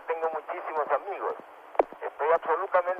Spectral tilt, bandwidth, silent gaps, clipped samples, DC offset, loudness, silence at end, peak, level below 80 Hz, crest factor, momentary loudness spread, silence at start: -5 dB/octave; 5.4 kHz; none; under 0.1%; under 0.1%; -29 LUFS; 0 s; -8 dBFS; -72 dBFS; 20 dB; 8 LU; 0 s